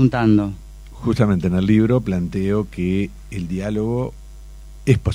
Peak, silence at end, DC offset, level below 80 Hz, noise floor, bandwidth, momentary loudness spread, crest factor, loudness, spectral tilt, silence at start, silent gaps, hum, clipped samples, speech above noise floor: 0 dBFS; 0 s; under 0.1%; -36 dBFS; -38 dBFS; 14.5 kHz; 11 LU; 18 dB; -20 LUFS; -8.5 dB/octave; 0 s; none; none; under 0.1%; 19 dB